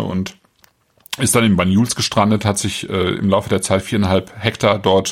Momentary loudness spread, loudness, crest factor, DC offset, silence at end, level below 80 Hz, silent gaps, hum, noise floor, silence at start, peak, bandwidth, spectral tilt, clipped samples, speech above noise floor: 8 LU; -17 LUFS; 16 dB; under 0.1%; 0 s; -46 dBFS; none; none; -56 dBFS; 0 s; -2 dBFS; 16.5 kHz; -4.5 dB/octave; under 0.1%; 40 dB